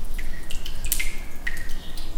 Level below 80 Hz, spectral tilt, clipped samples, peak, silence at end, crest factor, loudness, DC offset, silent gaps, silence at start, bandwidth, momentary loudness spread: -28 dBFS; -2 dB/octave; under 0.1%; -4 dBFS; 0 s; 16 dB; -31 LUFS; under 0.1%; none; 0 s; 17.5 kHz; 10 LU